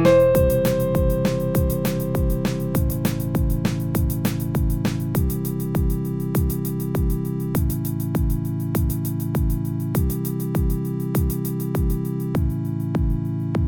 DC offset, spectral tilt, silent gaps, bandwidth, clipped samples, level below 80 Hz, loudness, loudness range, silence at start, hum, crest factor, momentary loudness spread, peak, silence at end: under 0.1%; -7.5 dB/octave; none; 17.5 kHz; under 0.1%; -28 dBFS; -23 LUFS; 2 LU; 0 s; none; 18 dB; 4 LU; -4 dBFS; 0 s